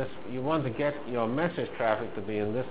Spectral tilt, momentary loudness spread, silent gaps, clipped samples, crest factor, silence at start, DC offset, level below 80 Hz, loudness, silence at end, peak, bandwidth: -5.5 dB/octave; 5 LU; none; under 0.1%; 20 dB; 0 s; 0.8%; -58 dBFS; -31 LUFS; 0 s; -10 dBFS; 4 kHz